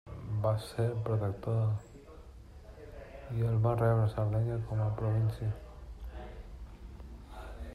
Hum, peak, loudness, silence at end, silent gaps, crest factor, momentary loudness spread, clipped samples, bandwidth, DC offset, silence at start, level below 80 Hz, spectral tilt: none; -16 dBFS; -33 LUFS; 0 s; none; 16 dB; 22 LU; under 0.1%; 11 kHz; under 0.1%; 0.05 s; -48 dBFS; -8.5 dB/octave